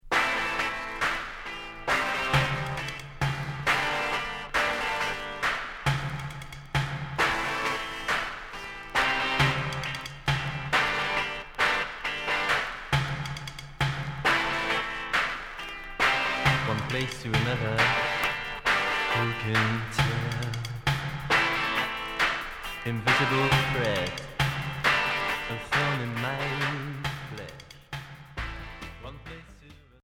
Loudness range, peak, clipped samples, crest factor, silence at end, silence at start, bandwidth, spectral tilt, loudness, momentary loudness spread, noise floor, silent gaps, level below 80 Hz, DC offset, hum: 4 LU; -10 dBFS; under 0.1%; 18 dB; 0.3 s; 0.05 s; 17.5 kHz; -4 dB/octave; -27 LUFS; 13 LU; -51 dBFS; none; -46 dBFS; under 0.1%; none